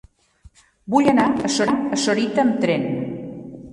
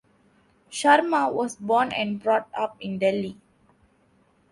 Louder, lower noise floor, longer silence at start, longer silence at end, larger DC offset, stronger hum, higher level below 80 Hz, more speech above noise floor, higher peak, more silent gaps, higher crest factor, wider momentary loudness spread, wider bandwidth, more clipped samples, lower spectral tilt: first, -20 LUFS vs -23 LUFS; second, -51 dBFS vs -63 dBFS; first, 0.85 s vs 0.7 s; second, 0 s vs 1.2 s; neither; neither; first, -54 dBFS vs -66 dBFS; second, 33 dB vs 39 dB; about the same, -4 dBFS vs -4 dBFS; neither; about the same, 18 dB vs 22 dB; first, 14 LU vs 11 LU; about the same, 11.5 kHz vs 11.5 kHz; neither; about the same, -4.5 dB/octave vs -4.5 dB/octave